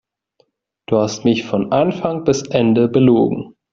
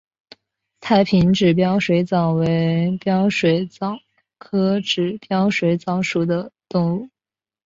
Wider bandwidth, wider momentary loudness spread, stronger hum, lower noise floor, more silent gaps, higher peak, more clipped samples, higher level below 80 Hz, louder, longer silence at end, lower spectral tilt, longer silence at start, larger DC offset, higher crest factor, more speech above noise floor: about the same, 7.6 kHz vs 7.6 kHz; second, 7 LU vs 10 LU; neither; second, -62 dBFS vs under -90 dBFS; neither; first, 0 dBFS vs -4 dBFS; neither; about the same, -52 dBFS vs -52 dBFS; first, -16 LUFS vs -19 LUFS; second, 0.25 s vs 0.6 s; about the same, -6.5 dB/octave vs -7 dB/octave; about the same, 0.9 s vs 0.8 s; neither; about the same, 16 dB vs 16 dB; second, 47 dB vs over 72 dB